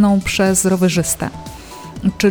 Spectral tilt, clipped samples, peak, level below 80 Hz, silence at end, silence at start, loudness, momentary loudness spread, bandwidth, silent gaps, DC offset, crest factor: -4.5 dB/octave; under 0.1%; -2 dBFS; -38 dBFS; 0 s; 0 s; -16 LUFS; 19 LU; over 20 kHz; none; under 0.1%; 14 dB